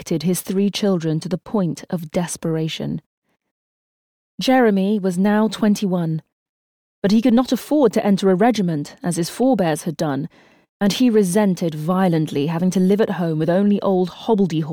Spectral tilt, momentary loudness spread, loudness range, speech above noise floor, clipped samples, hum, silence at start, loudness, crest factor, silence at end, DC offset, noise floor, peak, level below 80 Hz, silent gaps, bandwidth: -6 dB/octave; 8 LU; 5 LU; over 72 dB; under 0.1%; none; 0 s; -19 LUFS; 14 dB; 0 s; under 0.1%; under -90 dBFS; -6 dBFS; -56 dBFS; 3.06-3.22 s, 3.51-4.38 s, 6.32-7.02 s, 10.69-10.80 s; 19 kHz